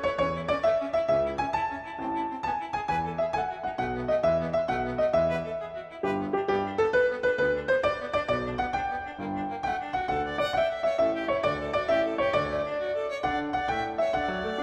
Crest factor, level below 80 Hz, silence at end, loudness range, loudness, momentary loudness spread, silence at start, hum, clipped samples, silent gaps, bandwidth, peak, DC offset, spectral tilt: 14 dB; -50 dBFS; 0 s; 2 LU; -28 LUFS; 6 LU; 0 s; none; under 0.1%; none; 9.4 kHz; -12 dBFS; under 0.1%; -6 dB/octave